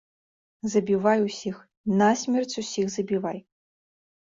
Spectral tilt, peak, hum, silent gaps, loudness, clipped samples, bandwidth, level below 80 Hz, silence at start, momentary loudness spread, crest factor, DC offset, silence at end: -5 dB/octave; -8 dBFS; none; 1.77-1.84 s; -26 LUFS; under 0.1%; 7.8 kHz; -66 dBFS; 0.65 s; 12 LU; 18 dB; under 0.1%; 0.95 s